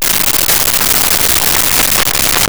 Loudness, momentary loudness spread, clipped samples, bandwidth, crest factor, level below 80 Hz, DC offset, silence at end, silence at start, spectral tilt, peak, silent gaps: -8 LUFS; 1 LU; under 0.1%; over 20 kHz; 12 dB; -30 dBFS; 4%; 0 s; 0 s; -0.5 dB/octave; 0 dBFS; none